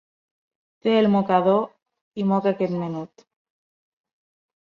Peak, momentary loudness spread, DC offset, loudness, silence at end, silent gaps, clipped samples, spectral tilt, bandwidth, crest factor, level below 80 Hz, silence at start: -6 dBFS; 16 LU; under 0.1%; -22 LUFS; 1.7 s; 1.82-1.86 s, 2.01-2.11 s; under 0.1%; -8.5 dB/octave; 6.2 kHz; 18 dB; -68 dBFS; 0.85 s